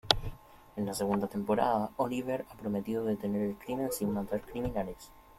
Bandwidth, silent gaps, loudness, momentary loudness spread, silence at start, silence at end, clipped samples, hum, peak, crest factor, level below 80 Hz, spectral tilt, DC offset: 16 kHz; none; -33 LUFS; 8 LU; 0.05 s; 0.05 s; under 0.1%; none; -2 dBFS; 30 dB; -52 dBFS; -5 dB/octave; under 0.1%